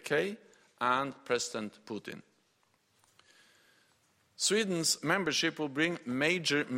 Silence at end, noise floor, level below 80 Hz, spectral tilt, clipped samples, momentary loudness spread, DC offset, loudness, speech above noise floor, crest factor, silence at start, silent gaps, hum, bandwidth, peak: 0 s; -73 dBFS; -76 dBFS; -3 dB/octave; under 0.1%; 14 LU; under 0.1%; -31 LUFS; 41 dB; 20 dB; 0.05 s; none; none; 16 kHz; -14 dBFS